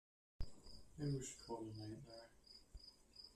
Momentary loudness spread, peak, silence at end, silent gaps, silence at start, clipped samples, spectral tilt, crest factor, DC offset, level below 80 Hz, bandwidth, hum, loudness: 16 LU; -32 dBFS; 0 s; none; 0.4 s; under 0.1%; -5.5 dB/octave; 20 dB; under 0.1%; -60 dBFS; 13.5 kHz; none; -52 LUFS